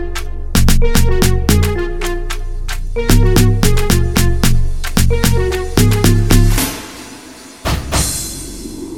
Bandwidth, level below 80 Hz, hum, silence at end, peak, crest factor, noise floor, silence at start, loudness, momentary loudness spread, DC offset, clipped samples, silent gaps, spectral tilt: 17.5 kHz; -16 dBFS; none; 0 s; 0 dBFS; 12 dB; -35 dBFS; 0 s; -15 LUFS; 14 LU; under 0.1%; under 0.1%; none; -5 dB/octave